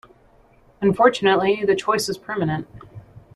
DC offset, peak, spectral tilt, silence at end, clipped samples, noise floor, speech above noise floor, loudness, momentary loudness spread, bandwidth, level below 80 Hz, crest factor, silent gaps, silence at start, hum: under 0.1%; -2 dBFS; -5 dB/octave; 0.15 s; under 0.1%; -54 dBFS; 34 dB; -20 LUFS; 9 LU; 13 kHz; -56 dBFS; 20 dB; none; 0.8 s; none